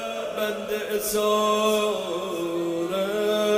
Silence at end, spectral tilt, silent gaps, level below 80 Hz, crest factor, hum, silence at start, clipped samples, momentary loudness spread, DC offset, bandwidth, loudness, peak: 0 s; -3.5 dB/octave; none; -60 dBFS; 16 dB; none; 0 s; under 0.1%; 7 LU; under 0.1%; 16 kHz; -25 LUFS; -8 dBFS